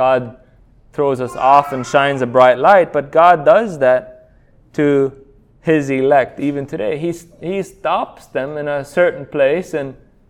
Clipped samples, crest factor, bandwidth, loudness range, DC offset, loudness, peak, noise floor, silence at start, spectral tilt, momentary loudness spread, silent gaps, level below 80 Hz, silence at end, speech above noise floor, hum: under 0.1%; 16 dB; 13.5 kHz; 7 LU; under 0.1%; -15 LUFS; 0 dBFS; -49 dBFS; 0 s; -6 dB/octave; 13 LU; none; -50 dBFS; 0.35 s; 34 dB; none